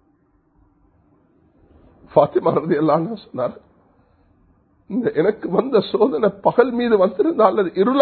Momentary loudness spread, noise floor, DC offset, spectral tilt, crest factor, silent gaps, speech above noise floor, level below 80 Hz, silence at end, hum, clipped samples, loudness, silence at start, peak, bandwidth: 10 LU; -60 dBFS; under 0.1%; -11.5 dB/octave; 20 dB; none; 43 dB; -58 dBFS; 0 s; none; under 0.1%; -18 LUFS; 2.15 s; 0 dBFS; 4.5 kHz